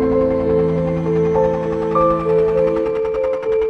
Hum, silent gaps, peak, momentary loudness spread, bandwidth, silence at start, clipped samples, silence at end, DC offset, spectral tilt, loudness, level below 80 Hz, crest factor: none; none; -4 dBFS; 4 LU; 6.6 kHz; 0 s; under 0.1%; 0 s; under 0.1%; -9 dB/octave; -17 LUFS; -38 dBFS; 12 dB